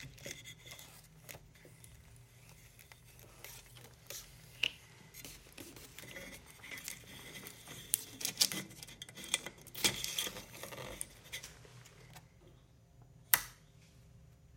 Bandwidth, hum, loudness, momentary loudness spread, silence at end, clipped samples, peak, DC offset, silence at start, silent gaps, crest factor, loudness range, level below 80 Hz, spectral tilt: 17 kHz; none; -39 LUFS; 25 LU; 0 s; under 0.1%; -4 dBFS; under 0.1%; 0 s; none; 40 dB; 17 LU; -66 dBFS; -0.5 dB/octave